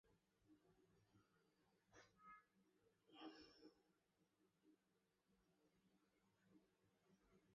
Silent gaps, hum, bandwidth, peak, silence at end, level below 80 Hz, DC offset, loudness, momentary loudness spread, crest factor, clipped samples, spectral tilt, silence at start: none; none; 6.8 kHz; -48 dBFS; 0 s; under -90 dBFS; under 0.1%; -66 LUFS; 6 LU; 24 dB; under 0.1%; -3 dB/octave; 0.05 s